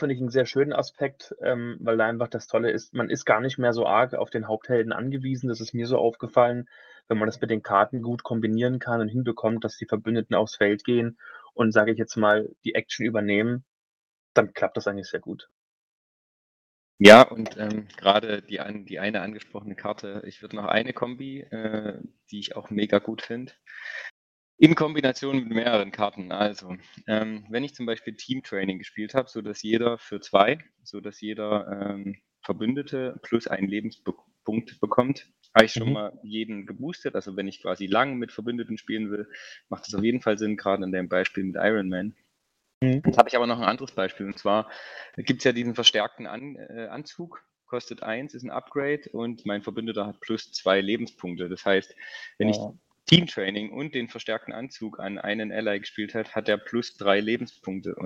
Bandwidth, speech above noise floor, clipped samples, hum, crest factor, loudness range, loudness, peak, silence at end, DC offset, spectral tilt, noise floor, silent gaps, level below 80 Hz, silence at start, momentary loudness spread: 15 kHz; 49 dB; under 0.1%; none; 26 dB; 11 LU; -25 LUFS; 0 dBFS; 0 s; under 0.1%; -5.5 dB/octave; -74 dBFS; 13.68-14.35 s, 15.51-16.98 s, 24.11-24.58 s, 42.74-42.81 s; -64 dBFS; 0 s; 15 LU